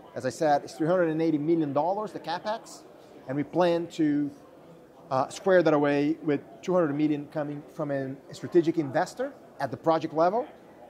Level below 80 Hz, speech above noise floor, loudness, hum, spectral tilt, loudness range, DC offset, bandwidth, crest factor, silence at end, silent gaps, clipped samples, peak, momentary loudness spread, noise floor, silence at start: -72 dBFS; 24 dB; -27 LUFS; none; -6.5 dB/octave; 3 LU; under 0.1%; 12.5 kHz; 18 dB; 0.05 s; none; under 0.1%; -10 dBFS; 12 LU; -51 dBFS; 0.05 s